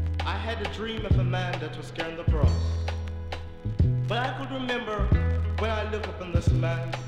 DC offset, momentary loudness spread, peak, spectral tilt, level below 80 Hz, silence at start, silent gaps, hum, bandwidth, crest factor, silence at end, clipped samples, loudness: under 0.1%; 9 LU; -10 dBFS; -7 dB/octave; -32 dBFS; 0 s; none; none; 9.2 kHz; 16 dB; 0 s; under 0.1%; -28 LUFS